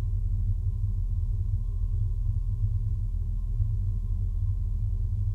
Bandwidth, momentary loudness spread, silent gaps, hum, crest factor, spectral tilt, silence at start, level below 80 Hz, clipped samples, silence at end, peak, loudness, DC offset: 1.1 kHz; 2 LU; none; none; 12 dB; -10.5 dB/octave; 0 s; -28 dBFS; under 0.1%; 0 s; -14 dBFS; -31 LUFS; under 0.1%